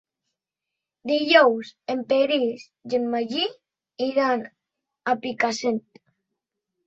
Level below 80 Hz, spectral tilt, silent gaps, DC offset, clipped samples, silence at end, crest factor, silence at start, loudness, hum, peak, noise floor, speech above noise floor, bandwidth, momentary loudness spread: -72 dBFS; -3.5 dB/octave; none; under 0.1%; under 0.1%; 1.05 s; 22 dB; 1.05 s; -23 LUFS; none; -2 dBFS; -86 dBFS; 63 dB; 8 kHz; 14 LU